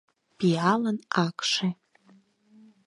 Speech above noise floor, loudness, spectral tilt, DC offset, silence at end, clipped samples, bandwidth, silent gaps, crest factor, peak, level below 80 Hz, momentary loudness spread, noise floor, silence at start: 35 dB; -26 LUFS; -5 dB/octave; under 0.1%; 1.15 s; under 0.1%; 11.5 kHz; none; 22 dB; -8 dBFS; -74 dBFS; 6 LU; -60 dBFS; 0.4 s